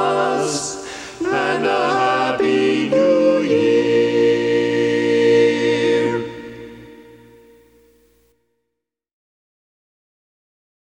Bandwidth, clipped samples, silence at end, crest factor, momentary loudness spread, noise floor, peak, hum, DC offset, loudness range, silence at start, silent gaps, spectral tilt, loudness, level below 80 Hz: 11 kHz; under 0.1%; 3.9 s; 14 dB; 13 LU; -79 dBFS; -4 dBFS; 60 Hz at -55 dBFS; under 0.1%; 8 LU; 0 s; none; -4.5 dB/octave; -17 LUFS; -58 dBFS